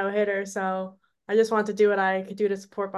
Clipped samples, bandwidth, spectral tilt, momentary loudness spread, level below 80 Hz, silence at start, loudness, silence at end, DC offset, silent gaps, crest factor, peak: under 0.1%; 12 kHz; -5.5 dB/octave; 8 LU; -76 dBFS; 0 s; -25 LUFS; 0 s; under 0.1%; none; 16 dB; -10 dBFS